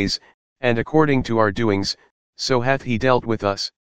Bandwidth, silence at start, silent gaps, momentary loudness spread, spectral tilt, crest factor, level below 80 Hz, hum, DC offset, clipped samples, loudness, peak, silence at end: 15.5 kHz; 0 s; 0.34-0.56 s, 2.11-2.33 s; 8 LU; -5.5 dB/octave; 20 dB; -44 dBFS; none; 2%; under 0.1%; -20 LUFS; -2 dBFS; 0.05 s